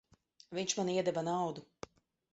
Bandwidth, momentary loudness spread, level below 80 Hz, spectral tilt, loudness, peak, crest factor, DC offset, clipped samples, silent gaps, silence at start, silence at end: 8 kHz; 19 LU; -74 dBFS; -4.5 dB/octave; -36 LUFS; -18 dBFS; 20 dB; under 0.1%; under 0.1%; none; 0.5 s; 0.7 s